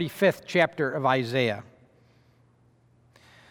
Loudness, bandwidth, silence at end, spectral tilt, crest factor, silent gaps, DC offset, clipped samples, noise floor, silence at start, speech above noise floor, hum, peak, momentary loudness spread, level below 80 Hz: -25 LUFS; over 20 kHz; 1.9 s; -6 dB/octave; 20 dB; none; under 0.1%; under 0.1%; -62 dBFS; 0 s; 36 dB; none; -8 dBFS; 4 LU; -72 dBFS